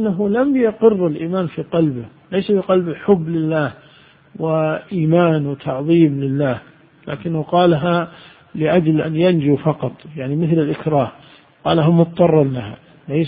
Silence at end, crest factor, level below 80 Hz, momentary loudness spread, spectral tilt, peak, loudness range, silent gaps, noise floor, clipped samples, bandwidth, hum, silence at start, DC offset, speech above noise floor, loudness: 0 s; 16 dB; -52 dBFS; 11 LU; -13 dB/octave; 0 dBFS; 2 LU; none; -48 dBFS; under 0.1%; 4.9 kHz; none; 0 s; under 0.1%; 31 dB; -17 LUFS